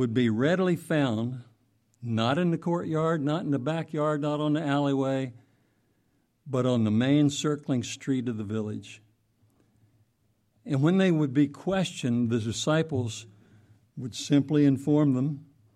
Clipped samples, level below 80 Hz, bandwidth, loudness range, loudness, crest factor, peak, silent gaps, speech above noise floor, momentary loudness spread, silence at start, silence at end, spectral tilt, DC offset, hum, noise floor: under 0.1%; -68 dBFS; 12.5 kHz; 3 LU; -27 LUFS; 16 dB; -10 dBFS; none; 45 dB; 12 LU; 0 s; 0.35 s; -6.5 dB/octave; under 0.1%; none; -71 dBFS